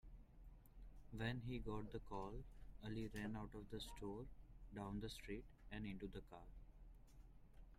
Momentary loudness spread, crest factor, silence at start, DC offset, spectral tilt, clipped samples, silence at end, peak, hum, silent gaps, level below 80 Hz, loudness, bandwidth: 18 LU; 20 dB; 0.05 s; under 0.1%; -6 dB/octave; under 0.1%; 0 s; -32 dBFS; none; none; -60 dBFS; -52 LUFS; 15.5 kHz